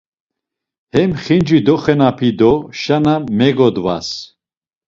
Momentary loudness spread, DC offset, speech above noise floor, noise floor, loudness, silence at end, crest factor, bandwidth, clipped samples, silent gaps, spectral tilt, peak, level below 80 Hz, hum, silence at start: 7 LU; under 0.1%; over 77 dB; under -90 dBFS; -14 LUFS; 0.65 s; 14 dB; 7.6 kHz; under 0.1%; none; -7 dB/octave; 0 dBFS; -46 dBFS; none; 0.95 s